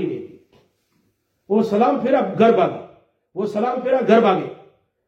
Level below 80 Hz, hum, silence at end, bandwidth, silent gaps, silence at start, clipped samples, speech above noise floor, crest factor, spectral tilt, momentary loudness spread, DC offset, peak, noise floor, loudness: -68 dBFS; none; 0.55 s; 8 kHz; none; 0 s; under 0.1%; 50 dB; 18 dB; -7.5 dB/octave; 17 LU; under 0.1%; -2 dBFS; -67 dBFS; -18 LUFS